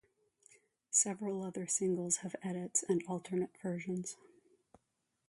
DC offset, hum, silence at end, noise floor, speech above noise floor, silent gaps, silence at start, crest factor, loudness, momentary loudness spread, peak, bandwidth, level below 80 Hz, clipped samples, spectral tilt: under 0.1%; none; 1.15 s; -84 dBFS; 47 dB; none; 0.9 s; 22 dB; -36 LUFS; 10 LU; -18 dBFS; 11.5 kHz; -82 dBFS; under 0.1%; -4.5 dB/octave